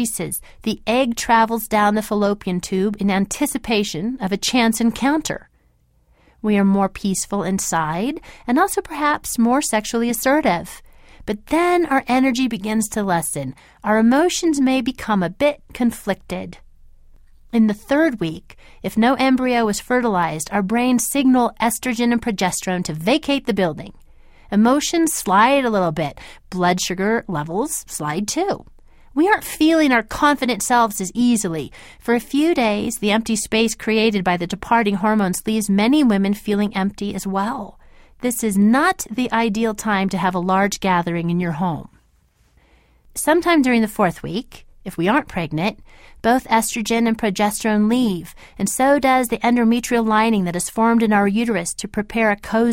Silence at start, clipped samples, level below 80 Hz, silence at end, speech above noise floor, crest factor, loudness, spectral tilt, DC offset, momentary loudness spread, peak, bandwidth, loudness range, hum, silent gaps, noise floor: 0 s; under 0.1%; -46 dBFS; 0 s; 40 dB; 18 dB; -19 LUFS; -4.5 dB/octave; under 0.1%; 10 LU; -2 dBFS; 16.5 kHz; 3 LU; none; none; -59 dBFS